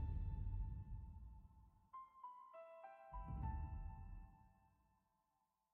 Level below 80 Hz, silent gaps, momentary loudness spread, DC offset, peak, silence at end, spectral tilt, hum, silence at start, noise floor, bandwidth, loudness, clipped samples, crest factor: -52 dBFS; none; 14 LU; under 0.1%; -36 dBFS; 1.05 s; -9.5 dB/octave; none; 0 s; -87 dBFS; 3.5 kHz; -53 LUFS; under 0.1%; 16 dB